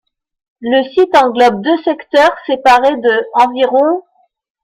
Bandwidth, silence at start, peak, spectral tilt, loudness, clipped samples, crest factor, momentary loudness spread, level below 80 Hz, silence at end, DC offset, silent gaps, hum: 15 kHz; 0.6 s; 0 dBFS; -4.5 dB/octave; -12 LUFS; under 0.1%; 12 dB; 6 LU; -52 dBFS; 0.65 s; under 0.1%; none; none